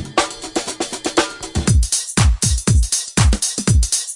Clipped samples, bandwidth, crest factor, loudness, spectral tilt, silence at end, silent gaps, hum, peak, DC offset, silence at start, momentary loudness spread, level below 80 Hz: under 0.1%; 11.5 kHz; 14 dB; -17 LUFS; -3.5 dB/octave; 0 s; none; none; -2 dBFS; under 0.1%; 0 s; 7 LU; -22 dBFS